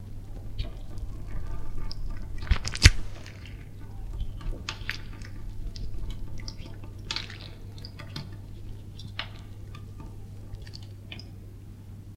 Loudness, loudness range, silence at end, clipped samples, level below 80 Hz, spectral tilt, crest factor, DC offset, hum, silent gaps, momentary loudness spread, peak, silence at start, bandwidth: -34 LUFS; 13 LU; 0 s; under 0.1%; -34 dBFS; -3.5 dB/octave; 30 dB; under 0.1%; none; none; 12 LU; 0 dBFS; 0 s; 14 kHz